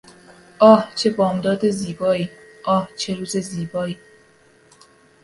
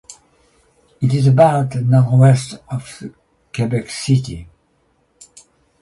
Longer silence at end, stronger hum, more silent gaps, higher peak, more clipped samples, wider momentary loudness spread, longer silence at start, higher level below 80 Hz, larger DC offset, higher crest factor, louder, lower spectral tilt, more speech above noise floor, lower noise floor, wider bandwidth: about the same, 1.3 s vs 1.35 s; neither; neither; about the same, 0 dBFS vs 0 dBFS; neither; second, 15 LU vs 20 LU; first, 0.6 s vs 0.1 s; second, -58 dBFS vs -48 dBFS; neither; about the same, 20 dB vs 16 dB; second, -20 LUFS vs -16 LUFS; second, -5.5 dB/octave vs -7 dB/octave; second, 35 dB vs 46 dB; second, -53 dBFS vs -61 dBFS; about the same, 11.5 kHz vs 11.5 kHz